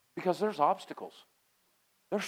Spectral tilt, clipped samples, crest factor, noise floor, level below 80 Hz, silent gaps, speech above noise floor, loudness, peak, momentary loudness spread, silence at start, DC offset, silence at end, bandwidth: -5 dB/octave; under 0.1%; 22 dB; -72 dBFS; -88 dBFS; none; 40 dB; -32 LUFS; -12 dBFS; 16 LU; 0.15 s; under 0.1%; 0 s; 17 kHz